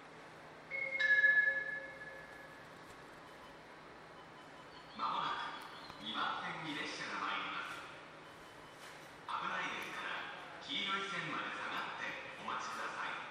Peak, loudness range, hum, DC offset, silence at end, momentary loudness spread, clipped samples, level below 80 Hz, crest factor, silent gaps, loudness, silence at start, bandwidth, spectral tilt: -20 dBFS; 10 LU; none; under 0.1%; 0 s; 19 LU; under 0.1%; -76 dBFS; 20 dB; none; -38 LUFS; 0 s; 15 kHz; -2.5 dB/octave